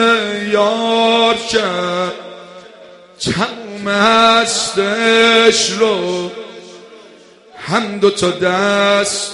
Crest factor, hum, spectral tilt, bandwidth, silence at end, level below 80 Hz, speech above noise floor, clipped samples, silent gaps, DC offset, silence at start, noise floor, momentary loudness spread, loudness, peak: 14 dB; none; -3 dB/octave; 11.5 kHz; 0 s; -54 dBFS; 29 dB; under 0.1%; none; under 0.1%; 0 s; -42 dBFS; 14 LU; -13 LUFS; 0 dBFS